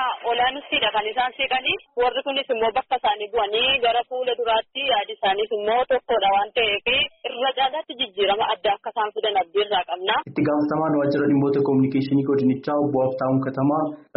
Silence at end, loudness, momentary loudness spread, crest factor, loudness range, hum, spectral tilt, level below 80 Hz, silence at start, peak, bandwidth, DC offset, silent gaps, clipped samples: 0.15 s; -22 LUFS; 4 LU; 14 dB; 2 LU; none; -2.5 dB/octave; -56 dBFS; 0 s; -8 dBFS; 5.4 kHz; under 0.1%; none; under 0.1%